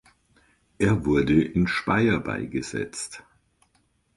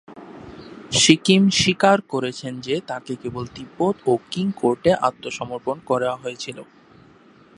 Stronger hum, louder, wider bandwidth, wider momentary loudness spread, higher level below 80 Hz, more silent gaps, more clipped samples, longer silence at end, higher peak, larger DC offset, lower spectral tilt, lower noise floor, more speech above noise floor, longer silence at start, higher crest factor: neither; second, -24 LUFS vs -20 LUFS; about the same, 11.5 kHz vs 11.5 kHz; second, 12 LU vs 22 LU; first, -46 dBFS vs -54 dBFS; neither; neither; about the same, 0.95 s vs 0.95 s; second, -8 dBFS vs 0 dBFS; neither; first, -6 dB/octave vs -4 dB/octave; first, -67 dBFS vs -51 dBFS; first, 44 dB vs 30 dB; first, 0.8 s vs 0.1 s; about the same, 18 dB vs 22 dB